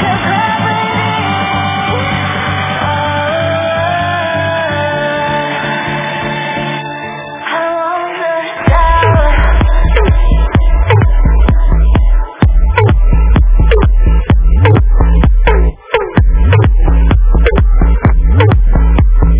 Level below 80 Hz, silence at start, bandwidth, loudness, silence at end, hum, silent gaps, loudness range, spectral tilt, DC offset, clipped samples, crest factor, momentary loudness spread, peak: -10 dBFS; 0 s; 3.8 kHz; -12 LUFS; 0 s; none; none; 5 LU; -10.5 dB/octave; under 0.1%; 0.2%; 8 dB; 7 LU; 0 dBFS